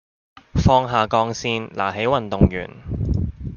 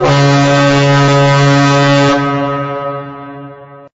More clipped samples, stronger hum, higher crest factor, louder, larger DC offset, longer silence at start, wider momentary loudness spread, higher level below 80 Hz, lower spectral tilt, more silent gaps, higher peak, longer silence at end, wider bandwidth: neither; neither; first, 18 dB vs 8 dB; second, -21 LUFS vs -10 LUFS; neither; first, 0.55 s vs 0 s; second, 10 LU vs 17 LU; first, -32 dBFS vs -42 dBFS; about the same, -6.5 dB/octave vs -6 dB/octave; neither; about the same, -2 dBFS vs -4 dBFS; second, 0 s vs 0.2 s; second, 7.2 kHz vs 8 kHz